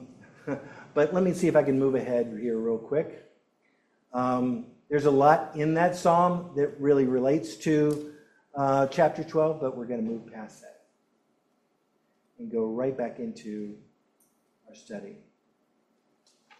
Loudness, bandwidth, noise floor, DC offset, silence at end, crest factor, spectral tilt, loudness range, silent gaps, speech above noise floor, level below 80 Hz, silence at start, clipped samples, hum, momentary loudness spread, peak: -26 LUFS; 13 kHz; -72 dBFS; under 0.1%; 1.45 s; 20 dB; -7 dB/octave; 12 LU; none; 46 dB; -68 dBFS; 0 s; under 0.1%; none; 18 LU; -8 dBFS